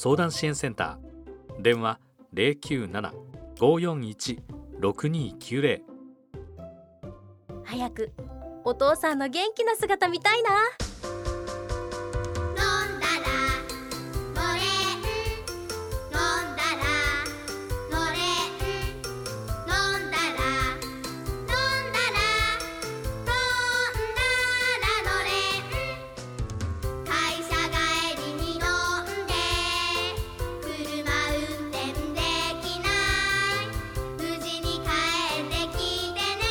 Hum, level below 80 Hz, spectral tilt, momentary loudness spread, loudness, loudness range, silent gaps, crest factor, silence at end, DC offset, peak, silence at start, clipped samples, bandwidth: none; -40 dBFS; -3.5 dB/octave; 12 LU; -27 LUFS; 4 LU; none; 20 dB; 0 s; under 0.1%; -8 dBFS; 0 s; under 0.1%; over 20 kHz